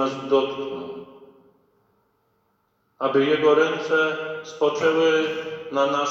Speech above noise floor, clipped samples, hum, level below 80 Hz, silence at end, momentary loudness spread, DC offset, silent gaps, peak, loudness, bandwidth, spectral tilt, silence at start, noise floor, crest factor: 47 dB; under 0.1%; none; -68 dBFS; 0 s; 13 LU; under 0.1%; none; -6 dBFS; -22 LUFS; 7.4 kHz; -4.5 dB/octave; 0 s; -68 dBFS; 18 dB